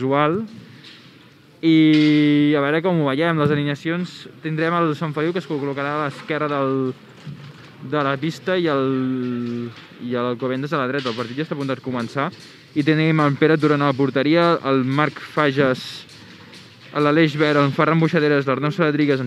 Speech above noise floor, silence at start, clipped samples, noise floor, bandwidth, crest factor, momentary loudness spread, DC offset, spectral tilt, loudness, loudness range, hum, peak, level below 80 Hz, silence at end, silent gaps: 29 dB; 0 s; under 0.1%; -48 dBFS; 11 kHz; 20 dB; 11 LU; under 0.1%; -7.5 dB/octave; -20 LUFS; 6 LU; none; 0 dBFS; -70 dBFS; 0 s; none